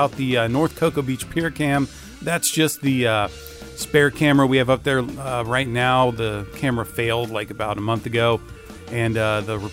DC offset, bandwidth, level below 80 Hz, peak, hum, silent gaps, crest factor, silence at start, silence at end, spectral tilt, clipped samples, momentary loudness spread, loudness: under 0.1%; 16 kHz; -46 dBFS; -4 dBFS; none; none; 18 dB; 0 s; 0 s; -5 dB/octave; under 0.1%; 10 LU; -21 LUFS